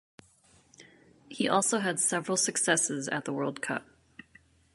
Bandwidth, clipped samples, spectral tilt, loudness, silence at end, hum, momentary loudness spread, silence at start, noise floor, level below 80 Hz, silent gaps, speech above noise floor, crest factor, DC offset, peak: 12 kHz; under 0.1%; -2.5 dB/octave; -28 LUFS; 0.9 s; none; 9 LU; 0.8 s; -63 dBFS; -74 dBFS; none; 34 dB; 24 dB; under 0.1%; -8 dBFS